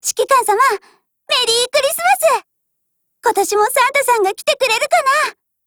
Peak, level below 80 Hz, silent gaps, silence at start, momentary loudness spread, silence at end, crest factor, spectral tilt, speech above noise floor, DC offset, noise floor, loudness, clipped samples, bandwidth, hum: 0 dBFS; -60 dBFS; none; 0.05 s; 5 LU; 0.35 s; 16 dB; 0.5 dB/octave; 56 dB; under 0.1%; -71 dBFS; -15 LUFS; under 0.1%; over 20 kHz; none